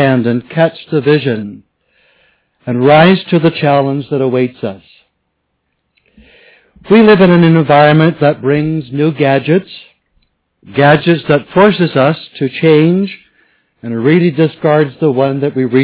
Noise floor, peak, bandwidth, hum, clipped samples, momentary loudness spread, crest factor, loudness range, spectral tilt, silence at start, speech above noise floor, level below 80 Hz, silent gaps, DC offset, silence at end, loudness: -66 dBFS; 0 dBFS; 4 kHz; none; 0.8%; 13 LU; 12 dB; 4 LU; -11 dB/octave; 0 s; 56 dB; -50 dBFS; none; under 0.1%; 0 s; -11 LUFS